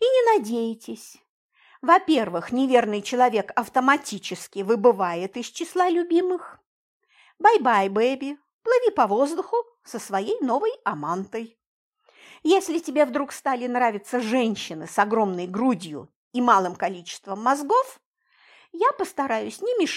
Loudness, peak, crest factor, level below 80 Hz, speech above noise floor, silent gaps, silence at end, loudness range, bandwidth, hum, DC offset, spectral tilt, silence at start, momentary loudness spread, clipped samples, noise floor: -23 LUFS; -4 dBFS; 20 dB; -72 dBFS; 37 dB; 1.29-1.49 s, 6.67-7.00 s, 8.53-8.59 s, 11.67-11.92 s, 16.16-16.31 s, 18.06-18.13 s; 0 s; 4 LU; 15.5 kHz; none; under 0.1%; -4.5 dB/octave; 0 s; 13 LU; under 0.1%; -60 dBFS